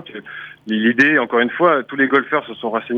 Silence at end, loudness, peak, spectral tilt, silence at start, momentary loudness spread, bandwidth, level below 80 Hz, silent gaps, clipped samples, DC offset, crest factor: 0 s; -16 LUFS; -2 dBFS; -6 dB/octave; 0.05 s; 19 LU; 7.2 kHz; -66 dBFS; none; under 0.1%; under 0.1%; 16 dB